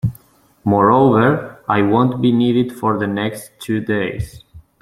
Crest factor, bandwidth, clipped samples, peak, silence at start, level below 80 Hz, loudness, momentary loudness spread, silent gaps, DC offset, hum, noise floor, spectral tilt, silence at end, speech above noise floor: 16 dB; 15 kHz; under 0.1%; -2 dBFS; 0.05 s; -46 dBFS; -16 LUFS; 13 LU; none; under 0.1%; none; -49 dBFS; -7.5 dB/octave; 0.2 s; 34 dB